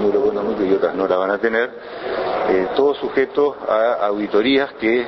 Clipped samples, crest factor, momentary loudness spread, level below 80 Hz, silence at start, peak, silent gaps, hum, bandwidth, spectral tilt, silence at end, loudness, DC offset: under 0.1%; 16 dB; 5 LU; -54 dBFS; 0 s; -2 dBFS; none; none; 6 kHz; -7 dB/octave; 0 s; -19 LUFS; under 0.1%